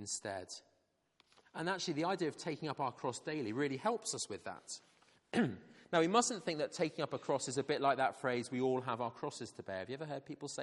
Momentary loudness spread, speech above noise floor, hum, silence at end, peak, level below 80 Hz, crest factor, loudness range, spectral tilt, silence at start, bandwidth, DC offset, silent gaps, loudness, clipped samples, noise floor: 13 LU; 40 dB; none; 0 s; -16 dBFS; -82 dBFS; 24 dB; 5 LU; -4 dB/octave; 0 s; 11.5 kHz; under 0.1%; none; -38 LUFS; under 0.1%; -78 dBFS